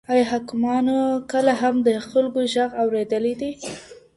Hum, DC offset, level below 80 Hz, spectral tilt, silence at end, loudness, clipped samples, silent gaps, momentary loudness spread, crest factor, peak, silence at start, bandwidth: none; under 0.1%; -60 dBFS; -4.5 dB/octave; 0.2 s; -21 LUFS; under 0.1%; none; 10 LU; 16 dB; -6 dBFS; 0.1 s; 11.5 kHz